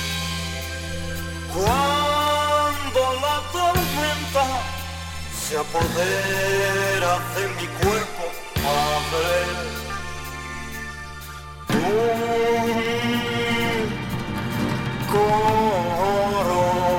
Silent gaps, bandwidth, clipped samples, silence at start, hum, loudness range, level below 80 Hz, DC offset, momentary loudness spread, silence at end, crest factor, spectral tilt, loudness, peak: none; 18.5 kHz; under 0.1%; 0 s; none; 4 LU; -38 dBFS; under 0.1%; 11 LU; 0 s; 18 dB; -4 dB/octave; -22 LUFS; -6 dBFS